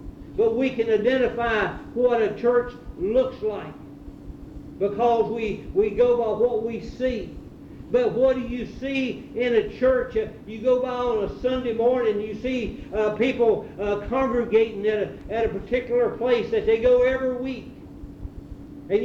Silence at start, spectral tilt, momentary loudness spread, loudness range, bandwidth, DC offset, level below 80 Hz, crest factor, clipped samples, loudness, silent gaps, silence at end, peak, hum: 0 s; -7 dB/octave; 19 LU; 3 LU; 7.2 kHz; under 0.1%; -44 dBFS; 16 dB; under 0.1%; -24 LUFS; none; 0 s; -8 dBFS; none